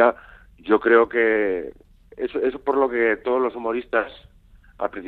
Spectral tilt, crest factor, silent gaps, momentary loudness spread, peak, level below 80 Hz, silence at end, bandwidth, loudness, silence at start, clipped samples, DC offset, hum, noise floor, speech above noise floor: -7.5 dB/octave; 20 dB; none; 15 LU; -2 dBFS; -52 dBFS; 0 s; 4.4 kHz; -21 LUFS; 0 s; under 0.1%; under 0.1%; none; -51 dBFS; 30 dB